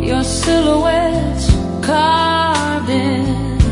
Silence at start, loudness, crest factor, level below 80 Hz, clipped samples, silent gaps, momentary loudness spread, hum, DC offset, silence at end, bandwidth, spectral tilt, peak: 0 s; -15 LUFS; 14 dB; -24 dBFS; under 0.1%; none; 4 LU; none; under 0.1%; 0 s; 11 kHz; -5 dB/octave; 0 dBFS